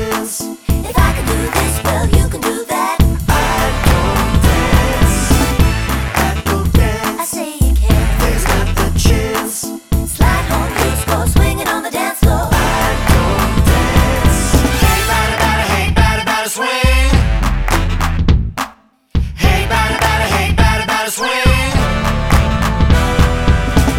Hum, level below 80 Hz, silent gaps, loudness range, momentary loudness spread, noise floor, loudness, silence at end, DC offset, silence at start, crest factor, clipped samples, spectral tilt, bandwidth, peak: none; -16 dBFS; none; 2 LU; 5 LU; -40 dBFS; -14 LUFS; 0 s; under 0.1%; 0 s; 12 dB; under 0.1%; -4.5 dB/octave; 17.5 kHz; 0 dBFS